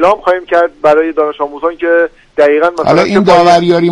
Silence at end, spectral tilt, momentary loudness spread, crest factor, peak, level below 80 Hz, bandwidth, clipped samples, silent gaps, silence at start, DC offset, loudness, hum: 0 s; -6 dB/octave; 9 LU; 10 dB; 0 dBFS; -44 dBFS; 11 kHz; 0.2%; none; 0 s; under 0.1%; -10 LUFS; none